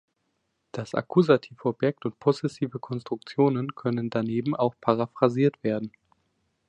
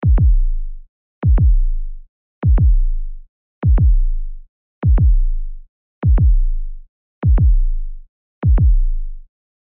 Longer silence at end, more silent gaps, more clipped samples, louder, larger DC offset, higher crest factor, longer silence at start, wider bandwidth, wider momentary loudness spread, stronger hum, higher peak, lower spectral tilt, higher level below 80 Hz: first, 0.8 s vs 0.45 s; second, none vs 0.89-1.22 s, 2.09-2.42 s, 3.29-3.62 s, 4.49-4.82 s, 5.69-6.02 s, 6.89-7.22 s, 8.09-8.42 s; neither; second, -26 LUFS vs -18 LUFS; neither; first, 22 dB vs 8 dB; first, 0.75 s vs 0 s; first, 9.2 kHz vs 2.5 kHz; second, 10 LU vs 18 LU; neither; about the same, -6 dBFS vs -6 dBFS; second, -8 dB/octave vs -11.5 dB/octave; second, -68 dBFS vs -16 dBFS